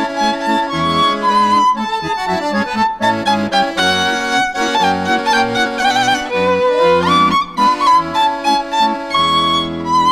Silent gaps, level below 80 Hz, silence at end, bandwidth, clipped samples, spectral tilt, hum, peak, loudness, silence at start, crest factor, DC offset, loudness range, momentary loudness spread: none; -46 dBFS; 0 s; 16 kHz; under 0.1%; -3.5 dB/octave; none; -2 dBFS; -14 LUFS; 0 s; 12 dB; under 0.1%; 2 LU; 5 LU